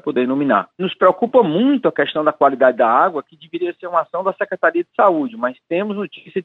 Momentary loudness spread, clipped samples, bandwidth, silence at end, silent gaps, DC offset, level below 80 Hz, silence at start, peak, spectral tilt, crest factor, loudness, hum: 11 LU; under 0.1%; 4.2 kHz; 0 s; none; under 0.1%; -70 dBFS; 0.05 s; -2 dBFS; -8 dB/octave; 16 dB; -17 LUFS; none